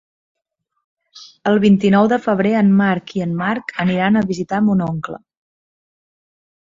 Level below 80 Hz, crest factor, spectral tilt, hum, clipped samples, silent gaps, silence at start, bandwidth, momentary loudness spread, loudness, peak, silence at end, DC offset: -56 dBFS; 16 dB; -7.5 dB/octave; none; under 0.1%; none; 1.15 s; 7.4 kHz; 11 LU; -16 LUFS; -2 dBFS; 1.5 s; under 0.1%